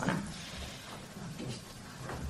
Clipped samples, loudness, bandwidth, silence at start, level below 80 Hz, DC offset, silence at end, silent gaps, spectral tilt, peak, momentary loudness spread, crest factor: under 0.1%; -42 LUFS; 13 kHz; 0 s; -54 dBFS; under 0.1%; 0 s; none; -4.5 dB/octave; -14 dBFS; 8 LU; 26 dB